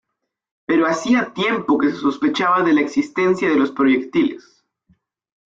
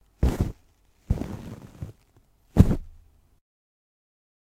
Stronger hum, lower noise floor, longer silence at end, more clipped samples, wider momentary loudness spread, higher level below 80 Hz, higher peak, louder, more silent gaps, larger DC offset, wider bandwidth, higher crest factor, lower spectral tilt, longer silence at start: neither; about the same, -62 dBFS vs -61 dBFS; second, 1.15 s vs 1.6 s; neither; second, 4 LU vs 21 LU; second, -62 dBFS vs -32 dBFS; second, -6 dBFS vs 0 dBFS; first, -18 LUFS vs -26 LUFS; neither; neither; second, 7.8 kHz vs 15.5 kHz; second, 14 dB vs 28 dB; second, -5.5 dB/octave vs -8.5 dB/octave; first, 0.7 s vs 0.2 s